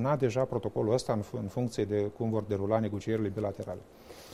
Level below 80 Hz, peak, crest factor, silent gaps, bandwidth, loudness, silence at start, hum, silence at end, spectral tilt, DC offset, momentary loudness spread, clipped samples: -58 dBFS; -12 dBFS; 18 dB; none; 15 kHz; -32 LUFS; 0 s; none; 0 s; -7 dB/octave; under 0.1%; 12 LU; under 0.1%